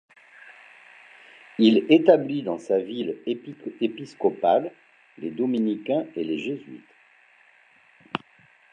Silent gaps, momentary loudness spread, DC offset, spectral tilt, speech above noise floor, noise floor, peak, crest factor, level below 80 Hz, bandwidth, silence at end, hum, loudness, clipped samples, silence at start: none; 18 LU; under 0.1%; -7 dB/octave; 34 dB; -57 dBFS; -2 dBFS; 22 dB; -76 dBFS; 8.6 kHz; 0.55 s; none; -24 LUFS; under 0.1%; 0.45 s